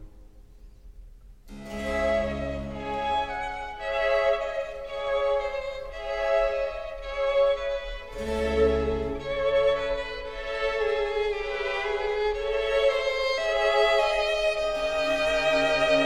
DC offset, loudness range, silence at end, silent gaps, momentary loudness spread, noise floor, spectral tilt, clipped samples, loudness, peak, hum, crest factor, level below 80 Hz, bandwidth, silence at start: 0.4%; 4 LU; 0 s; none; 11 LU; -49 dBFS; -4 dB/octave; under 0.1%; -26 LUFS; -10 dBFS; none; 16 dB; -42 dBFS; 12 kHz; 0 s